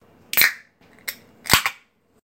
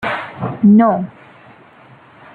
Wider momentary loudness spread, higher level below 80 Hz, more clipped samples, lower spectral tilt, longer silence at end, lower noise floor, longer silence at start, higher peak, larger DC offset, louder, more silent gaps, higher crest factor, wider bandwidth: about the same, 16 LU vs 15 LU; first, -48 dBFS vs -58 dBFS; neither; second, -1 dB/octave vs -9.5 dB/octave; second, 0.5 s vs 1.25 s; first, -54 dBFS vs -44 dBFS; first, 0.35 s vs 0 s; about the same, 0 dBFS vs -2 dBFS; neither; second, -19 LUFS vs -14 LUFS; neither; first, 24 dB vs 14 dB; first, 17.5 kHz vs 4.3 kHz